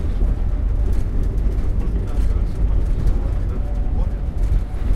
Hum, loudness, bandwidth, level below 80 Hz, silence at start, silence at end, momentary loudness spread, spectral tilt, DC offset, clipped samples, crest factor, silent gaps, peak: none; -23 LUFS; 4.6 kHz; -18 dBFS; 0 s; 0 s; 2 LU; -8.5 dB/octave; under 0.1%; under 0.1%; 12 dB; none; -6 dBFS